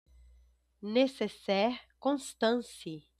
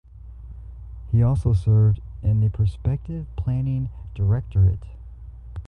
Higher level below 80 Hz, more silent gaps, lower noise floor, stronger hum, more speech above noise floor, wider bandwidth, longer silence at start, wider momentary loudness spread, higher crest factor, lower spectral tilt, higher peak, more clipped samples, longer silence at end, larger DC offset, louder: second, -66 dBFS vs -32 dBFS; neither; first, -65 dBFS vs -40 dBFS; neither; first, 33 dB vs 19 dB; first, 14 kHz vs 4 kHz; first, 0.8 s vs 0.15 s; second, 12 LU vs 22 LU; about the same, 18 dB vs 14 dB; second, -4.5 dB/octave vs -10.5 dB/octave; second, -14 dBFS vs -8 dBFS; neither; first, 0.2 s vs 0 s; neither; second, -32 LUFS vs -23 LUFS